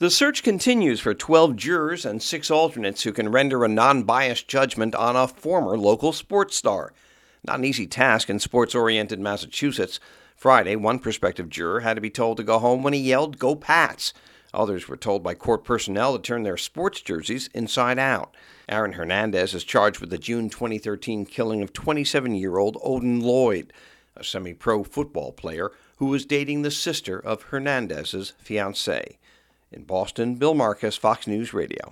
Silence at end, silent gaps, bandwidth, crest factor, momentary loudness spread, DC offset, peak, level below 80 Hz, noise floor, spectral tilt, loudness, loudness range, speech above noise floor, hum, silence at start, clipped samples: 0 s; none; 16.5 kHz; 22 dB; 10 LU; under 0.1%; 0 dBFS; -56 dBFS; -60 dBFS; -4 dB/octave; -23 LUFS; 6 LU; 37 dB; none; 0 s; under 0.1%